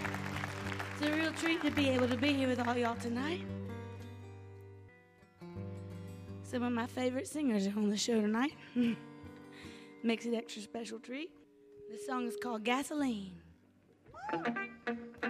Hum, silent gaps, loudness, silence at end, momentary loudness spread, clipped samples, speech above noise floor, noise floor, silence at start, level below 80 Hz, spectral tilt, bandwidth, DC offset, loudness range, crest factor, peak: none; none; -36 LUFS; 0 s; 20 LU; under 0.1%; 31 dB; -66 dBFS; 0 s; -70 dBFS; -5 dB/octave; 15.5 kHz; under 0.1%; 8 LU; 18 dB; -18 dBFS